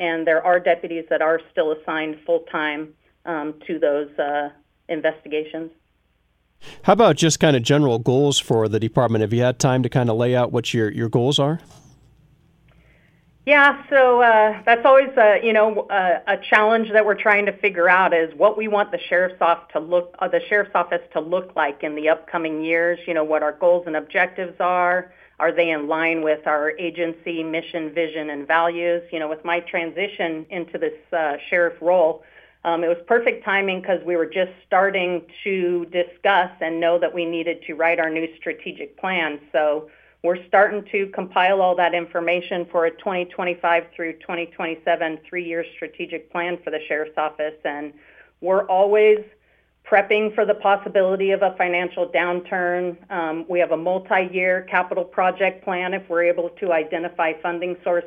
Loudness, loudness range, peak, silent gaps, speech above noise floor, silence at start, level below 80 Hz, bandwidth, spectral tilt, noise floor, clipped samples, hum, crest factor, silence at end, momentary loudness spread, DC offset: -20 LUFS; 8 LU; -2 dBFS; none; 45 dB; 0 s; -62 dBFS; 13 kHz; -5 dB/octave; -65 dBFS; under 0.1%; none; 20 dB; 0 s; 11 LU; under 0.1%